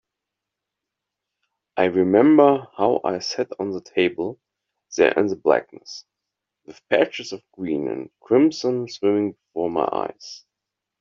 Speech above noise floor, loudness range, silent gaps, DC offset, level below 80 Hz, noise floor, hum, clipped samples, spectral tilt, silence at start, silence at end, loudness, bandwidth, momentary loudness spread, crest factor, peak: 64 dB; 4 LU; none; under 0.1%; -66 dBFS; -84 dBFS; none; under 0.1%; -4 dB/octave; 1.75 s; 0.65 s; -21 LUFS; 7.4 kHz; 16 LU; 20 dB; -2 dBFS